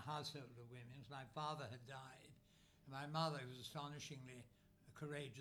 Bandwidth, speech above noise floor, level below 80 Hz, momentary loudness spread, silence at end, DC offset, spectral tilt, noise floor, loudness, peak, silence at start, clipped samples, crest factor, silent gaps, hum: 19.5 kHz; 21 dB; -80 dBFS; 18 LU; 0 s; under 0.1%; -5 dB/octave; -72 dBFS; -51 LUFS; -30 dBFS; 0 s; under 0.1%; 22 dB; none; none